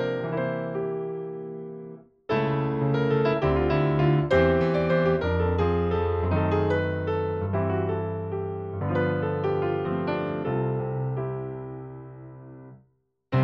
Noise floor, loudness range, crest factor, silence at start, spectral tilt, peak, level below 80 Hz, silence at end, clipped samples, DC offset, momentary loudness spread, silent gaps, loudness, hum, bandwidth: -68 dBFS; 6 LU; 16 dB; 0 s; -9.5 dB/octave; -8 dBFS; -44 dBFS; 0 s; under 0.1%; under 0.1%; 15 LU; none; -26 LUFS; none; 6.6 kHz